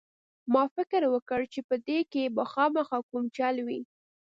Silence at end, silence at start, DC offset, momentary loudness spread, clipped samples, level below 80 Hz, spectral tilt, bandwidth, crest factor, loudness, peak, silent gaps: 0.4 s; 0.45 s; under 0.1%; 8 LU; under 0.1%; -72 dBFS; -6 dB/octave; 7.6 kHz; 18 dB; -29 LUFS; -12 dBFS; 0.71-0.76 s, 1.22-1.26 s, 1.64-1.69 s, 3.03-3.09 s